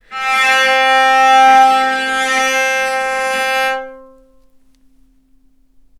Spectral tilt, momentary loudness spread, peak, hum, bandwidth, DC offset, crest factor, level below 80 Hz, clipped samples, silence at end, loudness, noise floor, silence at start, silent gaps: 0 dB/octave; 9 LU; 0 dBFS; none; 15 kHz; under 0.1%; 14 dB; -54 dBFS; under 0.1%; 2 s; -11 LUFS; -51 dBFS; 0.1 s; none